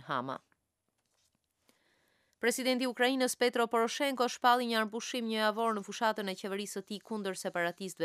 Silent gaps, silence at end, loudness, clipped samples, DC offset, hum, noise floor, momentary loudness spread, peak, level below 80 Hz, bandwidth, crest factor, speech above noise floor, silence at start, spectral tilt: none; 0 s; -32 LUFS; under 0.1%; under 0.1%; none; -82 dBFS; 9 LU; -12 dBFS; -88 dBFS; 15.5 kHz; 20 dB; 50 dB; 0 s; -3 dB/octave